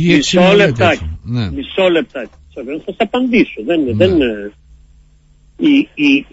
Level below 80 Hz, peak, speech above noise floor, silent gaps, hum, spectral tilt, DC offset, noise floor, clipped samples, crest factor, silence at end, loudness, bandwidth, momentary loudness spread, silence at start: -38 dBFS; 0 dBFS; 34 dB; none; none; -5.5 dB/octave; under 0.1%; -47 dBFS; under 0.1%; 14 dB; 0.1 s; -13 LUFS; 8 kHz; 16 LU; 0 s